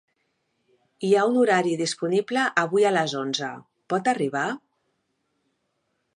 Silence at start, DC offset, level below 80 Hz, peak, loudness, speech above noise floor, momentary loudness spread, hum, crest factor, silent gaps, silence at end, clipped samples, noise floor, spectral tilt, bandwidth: 1 s; under 0.1%; -80 dBFS; -6 dBFS; -23 LUFS; 52 dB; 10 LU; none; 20 dB; none; 1.6 s; under 0.1%; -75 dBFS; -4.5 dB/octave; 11 kHz